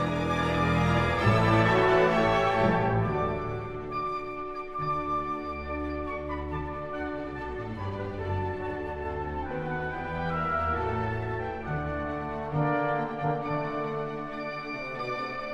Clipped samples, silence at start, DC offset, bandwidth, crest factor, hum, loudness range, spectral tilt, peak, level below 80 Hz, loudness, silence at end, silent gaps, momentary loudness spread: under 0.1%; 0 s; under 0.1%; 12 kHz; 18 dB; none; 9 LU; -7 dB/octave; -10 dBFS; -46 dBFS; -29 LUFS; 0 s; none; 12 LU